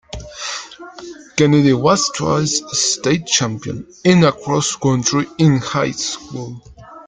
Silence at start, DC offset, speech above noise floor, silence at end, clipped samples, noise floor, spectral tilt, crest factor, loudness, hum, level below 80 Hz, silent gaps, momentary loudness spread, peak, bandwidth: 0.15 s; under 0.1%; 19 dB; 0.05 s; under 0.1%; -35 dBFS; -4.5 dB/octave; 16 dB; -16 LUFS; none; -46 dBFS; none; 18 LU; 0 dBFS; 9.6 kHz